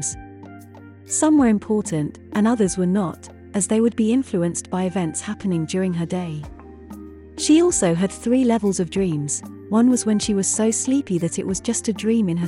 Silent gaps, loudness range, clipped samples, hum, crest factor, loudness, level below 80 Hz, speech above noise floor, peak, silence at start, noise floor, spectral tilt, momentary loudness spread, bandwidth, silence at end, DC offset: none; 3 LU; under 0.1%; none; 14 dB; -20 LUFS; -50 dBFS; 22 dB; -6 dBFS; 0 s; -42 dBFS; -5 dB/octave; 15 LU; 12 kHz; 0 s; under 0.1%